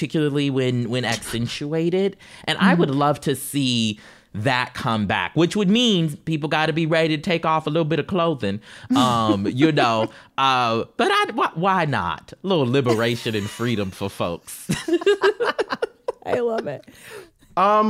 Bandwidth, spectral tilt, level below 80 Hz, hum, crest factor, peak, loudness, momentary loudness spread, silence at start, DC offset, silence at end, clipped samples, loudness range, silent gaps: 16 kHz; -5.5 dB/octave; -56 dBFS; none; 18 dB; -4 dBFS; -21 LUFS; 10 LU; 0 s; under 0.1%; 0 s; under 0.1%; 3 LU; none